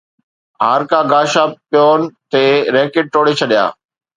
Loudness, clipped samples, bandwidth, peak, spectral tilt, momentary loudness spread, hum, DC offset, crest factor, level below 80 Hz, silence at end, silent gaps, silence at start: -13 LUFS; under 0.1%; 10 kHz; 0 dBFS; -4.5 dB/octave; 4 LU; none; under 0.1%; 14 dB; -64 dBFS; 0.45 s; none; 0.6 s